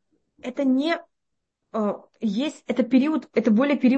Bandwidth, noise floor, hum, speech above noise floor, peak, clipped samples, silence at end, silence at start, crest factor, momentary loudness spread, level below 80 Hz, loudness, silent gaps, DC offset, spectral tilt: 8.4 kHz; -81 dBFS; none; 59 dB; -8 dBFS; under 0.1%; 0 s; 0.45 s; 16 dB; 9 LU; -70 dBFS; -24 LUFS; none; under 0.1%; -6.5 dB/octave